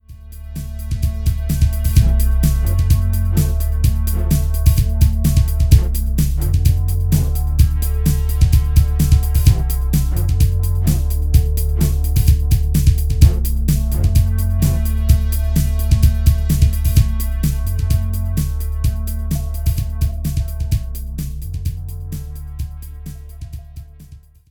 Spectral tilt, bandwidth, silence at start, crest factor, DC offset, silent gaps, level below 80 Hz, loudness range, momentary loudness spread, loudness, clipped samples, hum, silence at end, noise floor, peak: -6.5 dB/octave; 19.5 kHz; 0.1 s; 16 dB; under 0.1%; none; -18 dBFS; 7 LU; 14 LU; -17 LUFS; under 0.1%; none; 0.35 s; -41 dBFS; 0 dBFS